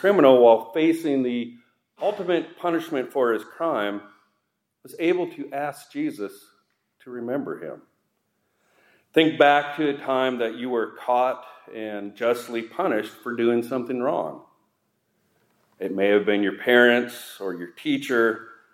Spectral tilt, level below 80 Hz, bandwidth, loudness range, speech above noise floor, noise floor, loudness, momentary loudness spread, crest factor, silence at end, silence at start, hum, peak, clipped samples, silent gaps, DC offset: -5.5 dB/octave; -82 dBFS; 16 kHz; 8 LU; 53 dB; -76 dBFS; -23 LUFS; 17 LU; 22 dB; 0.2 s; 0 s; none; -2 dBFS; under 0.1%; none; under 0.1%